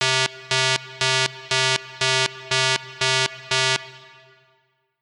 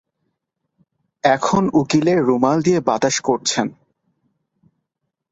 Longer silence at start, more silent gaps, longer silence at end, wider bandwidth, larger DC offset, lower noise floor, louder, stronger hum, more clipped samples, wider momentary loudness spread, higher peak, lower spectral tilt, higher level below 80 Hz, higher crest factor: second, 0 s vs 1.25 s; neither; second, 1.05 s vs 1.6 s; first, 12 kHz vs 8 kHz; neither; second, -66 dBFS vs -78 dBFS; second, -21 LUFS vs -18 LUFS; neither; neither; second, 2 LU vs 5 LU; about the same, -2 dBFS vs -2 dBFS; second, -1.5 dB/octave vs -4.5 dB/octave; second, -68 dBFS vs -56 dBFS; about the same, 22 dB vs 18 dB